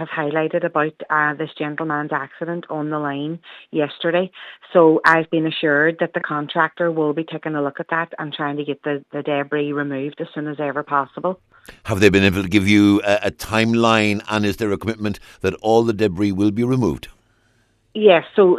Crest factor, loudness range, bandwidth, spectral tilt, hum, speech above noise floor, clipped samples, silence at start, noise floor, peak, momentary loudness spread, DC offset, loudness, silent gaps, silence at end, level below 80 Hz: 20 dB; 7 LU; 14 kHz; -6 dB/octave; none; 42 dB; under 0.1%; 0 s; -61 dBFS; 0 dBFS; 12 LU; under 0.1%; -19 LUFS; none; 0 s; -50 dBFS